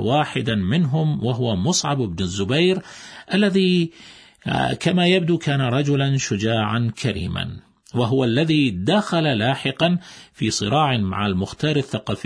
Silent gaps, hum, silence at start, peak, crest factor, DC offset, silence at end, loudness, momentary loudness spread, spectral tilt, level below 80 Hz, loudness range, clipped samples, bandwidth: none; none; 0 s; -6 dBFS; 16 dB; under 0.1%; 0 s; -20 LUFS; 8 LU; -5.5 dB/octave; -50 dBFS; 1 LU; under 0.1%; 10.5 kHz